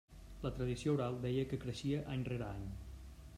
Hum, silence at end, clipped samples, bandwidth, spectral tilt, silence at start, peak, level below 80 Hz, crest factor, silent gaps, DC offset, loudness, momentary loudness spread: none; 0 s; under 0.1%; 14 kHz; -7 dB/octave; 0.1 s; -24 dBFS; -54 dBFS; 16 dB; none; under 0.1%; -40 LUFS; 15 LU